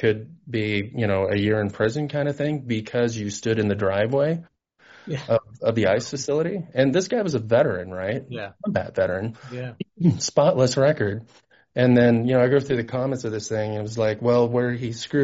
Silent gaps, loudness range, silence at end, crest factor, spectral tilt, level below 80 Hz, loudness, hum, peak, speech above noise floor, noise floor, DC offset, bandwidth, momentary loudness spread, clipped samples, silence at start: none; 4 LU; 0 s; 18 dB; -6 dB/octave; -58 dBFS; -23 LUFS; none; -4 dBFS; 31 dB; -53 dBFS; under 0.1%; 8 kHz; 11 LU; under 0.1%; 0 s